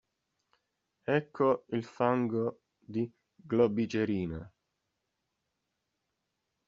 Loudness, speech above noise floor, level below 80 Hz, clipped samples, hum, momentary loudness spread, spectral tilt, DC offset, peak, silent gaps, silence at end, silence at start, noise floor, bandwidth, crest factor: -32 LUFS; 53 dB; -66 dBFS; under 0.1%; none; 11 LU; -6.5 dB/octave; under 0.1%; -12 dBFS; none; 2.2 s; 1.1 s; -84 dBFS; 7.4 kHz; 22 dB